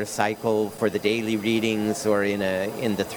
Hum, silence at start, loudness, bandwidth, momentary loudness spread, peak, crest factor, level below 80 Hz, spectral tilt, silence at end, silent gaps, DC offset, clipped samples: none; 0 s; -24 LUFS; over 20 kHz; 3 LU; -6 dBFS; 18 dB; -62 dBFS; -4.5 dB/octave; 0 s; none; under 0.1%; under 0.1%